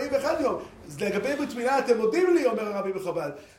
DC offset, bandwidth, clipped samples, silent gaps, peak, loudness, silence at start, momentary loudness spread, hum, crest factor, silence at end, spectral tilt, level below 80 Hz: under 0.1%; 16 kHz; under 0.1%; none; -10 dBFS; -26 LUFS; 0 s; 10 LU; none; 16 dB; 0.15 s; -5 dB/octave; -62 dBFS